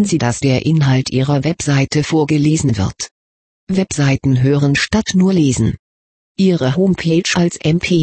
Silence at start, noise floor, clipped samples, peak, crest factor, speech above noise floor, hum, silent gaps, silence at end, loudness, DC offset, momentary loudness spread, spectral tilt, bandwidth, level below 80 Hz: 0 s; under -90 dBFS; under 0.1%; -2 dBFS; 12 dB; over 76 dB; none; 3.11-3.67 s, 5.79-6.35 s; 0 s; -15 LUFS; 0.1%; 6 LU; -5.5 dB/octave; 8.8 kHz; -40 dBFS